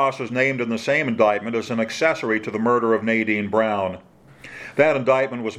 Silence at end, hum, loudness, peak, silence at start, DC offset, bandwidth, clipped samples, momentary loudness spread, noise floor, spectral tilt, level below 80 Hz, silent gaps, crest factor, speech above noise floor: 0 s; none; -21 LUFS; -2 dBFS; 0 s; under 0.1%; 12.5 kHz; under 0.1%; 7 LU; -42 dBFS; -5.5 dB/octave; -64 dBFS; none; 18 dB; 22 dB